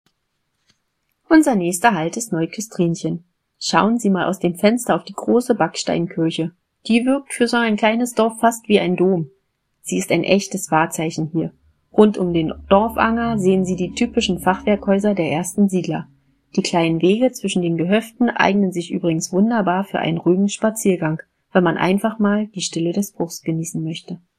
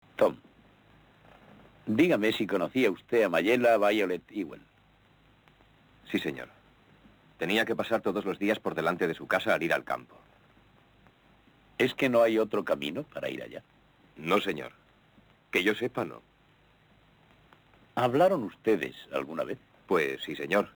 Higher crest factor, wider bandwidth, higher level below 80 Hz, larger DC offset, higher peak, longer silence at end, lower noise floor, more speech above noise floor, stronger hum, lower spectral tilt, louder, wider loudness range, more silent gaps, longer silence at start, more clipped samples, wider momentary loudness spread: about the same, 18 dB vs 18 dB; second, 15 kHz vs 19.5 kHz; first, -52 dBFS vs -68 dBFS; neither; first, 0 dBFS vs -12 dBFS; about the same, 0.2 s vs 0.1 s; first, -71 dBFS vs -63 dBFS; first, 53 dB vs 35 dB; neither; about the same, -5.5 dB/octave vs -5.5 dB/octave; first, -19 LUFS vs -29 LUFS; second, 2 LU vs 7 LU; neither; first, 1.3 s vs 0.2 s; neither; second, 9 LU vs 14 LU